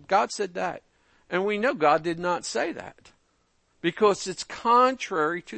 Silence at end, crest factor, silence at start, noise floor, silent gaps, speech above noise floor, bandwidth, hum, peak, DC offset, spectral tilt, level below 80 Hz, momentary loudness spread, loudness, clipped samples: 0 s; 18 dB; 0.1 s; -69 dBFS; none; 43 dB; 8.8 kHz; none; -8 dBFS; under 0.1%; -4 dB/octave; -66 dBFS; 12 LU; -25 LUFS; under 0.1%